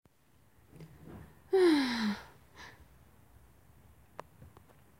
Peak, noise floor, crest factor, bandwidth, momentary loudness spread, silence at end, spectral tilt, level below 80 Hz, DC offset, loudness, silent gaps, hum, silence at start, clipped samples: -18 dBFS; -67 dBFS; 20 dB; 16 kHz; 27 LU; 2.3 s; -5 dB/octave; -64 dBFS; under 0.1%; -30 LUFS; none; none; 0.8 s; under 0.1%